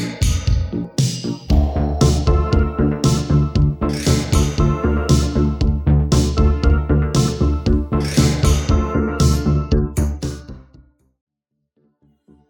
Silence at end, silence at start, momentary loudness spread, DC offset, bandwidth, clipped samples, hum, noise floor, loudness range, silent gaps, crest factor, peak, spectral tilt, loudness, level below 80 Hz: 1.9 s; 0 s; 5 LU; under 0.1%; 18 kHz; under 0.1%; none; -75 dBFS; 3 LU; none; 16 dB; -2 dBFS; -6 dB/octave; -18 LUFS; -22 dBFS